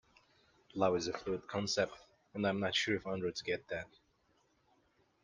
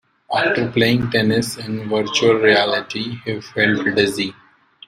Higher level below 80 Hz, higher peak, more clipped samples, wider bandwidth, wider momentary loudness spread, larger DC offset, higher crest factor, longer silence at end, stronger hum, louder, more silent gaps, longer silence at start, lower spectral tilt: second, -70 dBFS vs -52 dBFS; second, -18 dBFS vs 0 dBFS; neither; second, 10 kHz vs 15.5 kHz; about the same, 11 LU vs 11 LU; neither; about the same, 20 dB vs 18 dB; first, 1.35 s vs 0.55 s; neither; second, -37 LUFS vs -18 LUFS; neither; first, 0.75 s vs 0.3 s; about the same, -4 dB/octave vs -4.5 dB/octave